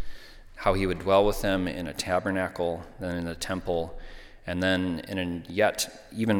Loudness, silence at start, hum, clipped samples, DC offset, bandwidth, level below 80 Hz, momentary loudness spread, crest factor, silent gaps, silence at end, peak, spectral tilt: -28 LUFS; 0 s; none; under 0.1%; under 0.1%; 19 kHz; -42 dBFS; 12 LU; 20 dB; none; 0 s; -8 dBFS; -5 dB/octave